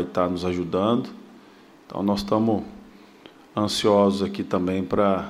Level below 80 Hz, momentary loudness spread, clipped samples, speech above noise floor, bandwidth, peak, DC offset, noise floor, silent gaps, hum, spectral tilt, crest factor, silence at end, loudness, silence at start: -54 dBFS; 10 LU; under 0.1%; 28 dB; 14.5 kHz; -6 dBFS; under 0.1%; -50 dBFS; none; none; -6 dB/octave; 18 dB; 0 s; -23 LUFS; 0 s